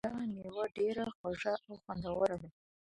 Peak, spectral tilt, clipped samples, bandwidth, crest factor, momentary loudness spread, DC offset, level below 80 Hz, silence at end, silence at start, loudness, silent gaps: -18 dBFS; -6.5 dB/octave; under 0.1%; 11.5 kHz; 20 dB; 9 LU; under 0.1%; -64 dBFS; 0.4 s; 0.05 s; -38 LUFS; 1.15-1.24 s